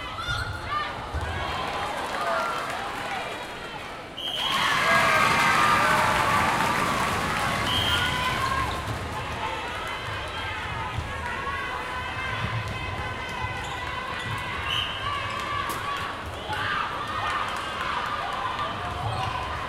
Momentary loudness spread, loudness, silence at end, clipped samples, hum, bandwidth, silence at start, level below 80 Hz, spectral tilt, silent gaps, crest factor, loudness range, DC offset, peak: 11 LU; -26 LUFS; 0 s; under 0.1%; none; 16.5 kHz; 0 s; -44 dBFS; -3.5 dB/octave; none; 20 dB; 9 LU; under 0.1%; -8 dBFS